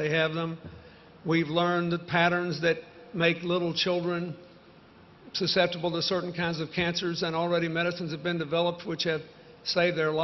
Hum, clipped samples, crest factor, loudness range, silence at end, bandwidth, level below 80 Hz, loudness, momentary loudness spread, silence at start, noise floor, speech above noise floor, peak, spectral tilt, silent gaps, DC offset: none; under 0.1%; 20 dB; 2 LU; 0 s; 6.4 kHz; -64 dBFS; -28 LUFS; 10 LU; 0 s; -54 dBFS; 26 dB; -8 dBFS; -5.5 dB/octave; none; under 0.1%